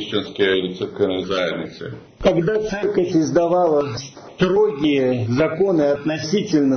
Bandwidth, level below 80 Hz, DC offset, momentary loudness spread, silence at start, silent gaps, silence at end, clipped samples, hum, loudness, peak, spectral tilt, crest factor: 6.6 kHz; -48 dBFS; under 0.1%; 10 LU; 0 s; none; 0 s; under 0.1%; none; -19 LUFS; -6 dBFS; -6 dB/octave; 14 dB